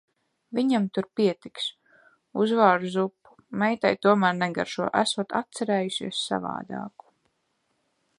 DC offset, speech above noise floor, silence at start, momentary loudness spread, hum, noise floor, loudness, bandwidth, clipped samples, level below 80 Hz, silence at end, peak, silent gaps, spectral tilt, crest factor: under 0.1%; 49 dB; 0.5 s; 12 LU; none; -74 dBFS; -25 LUFS; 11 kHz; under 0.1%; -72 dBFS; 1.3 s; -4 dBFS; none; -5 dB/octave; 22 dB